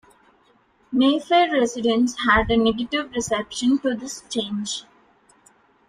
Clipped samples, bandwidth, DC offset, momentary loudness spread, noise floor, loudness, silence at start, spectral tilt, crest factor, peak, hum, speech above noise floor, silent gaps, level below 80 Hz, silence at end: under 0.1%; 12.5 kHz; under 0.1%; 10 LU; -60 dBFS; -21 LUFS; 0.9 s; -3.5 dB/octave; 18 dB; -4 dBFS; none; 39 dB; none; -44 dBFS; 1.05 s